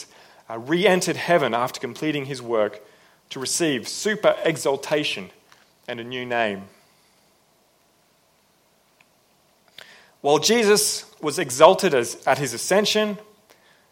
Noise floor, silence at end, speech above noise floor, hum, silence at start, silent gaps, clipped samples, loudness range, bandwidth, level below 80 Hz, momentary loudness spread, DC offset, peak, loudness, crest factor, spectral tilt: -62 dBFS; 0.7 s; 40 dB; none; 0 s; none; under 0.1%; 12 LU; 16.5 kHz; -68 dBFS; 17 LU; under 0.1%; 0 dBFS; -21 LUFS; 24 dB; -3 dB/octave